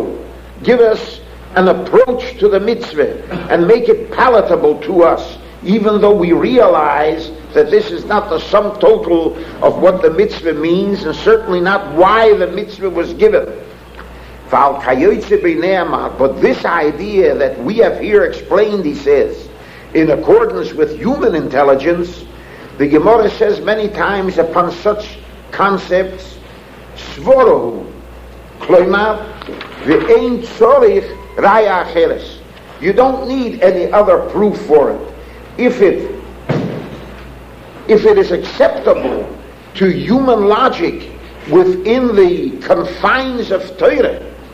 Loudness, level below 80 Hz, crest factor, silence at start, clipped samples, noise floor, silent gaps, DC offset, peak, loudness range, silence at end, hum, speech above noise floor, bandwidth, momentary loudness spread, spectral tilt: -12 LUFS; -38 dBFS; 12 dB; 0 s; under 0.1%; -35 dBFS; none; under 0.1%; 0 dBFS; 3 LU; 0 s; none; 23 dB; 8.4 kHz; 16 LU; -7 dB/octave